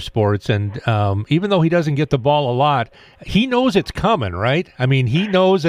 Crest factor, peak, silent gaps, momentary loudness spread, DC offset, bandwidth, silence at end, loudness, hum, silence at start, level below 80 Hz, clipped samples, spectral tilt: 16 dB; -2 dBFS; none; 4 LU; under 0.1%; 10.5 kHz; 0 s; -17 LUFS; none; 0 s; -42 dBFS; under 0.1%; -7 dB/octave